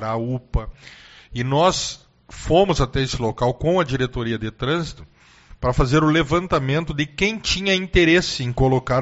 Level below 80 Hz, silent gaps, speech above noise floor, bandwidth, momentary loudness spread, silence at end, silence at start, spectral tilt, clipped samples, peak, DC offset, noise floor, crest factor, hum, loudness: -34 dBFS; none; 27 dB; 8 kHz; 11 LU; 0 s; 0 s; -4.5 dB/octave; under 0.1%; -2 dBFS; under 0.1%; -47 dBFS; 18 dB; none; -20 LUFS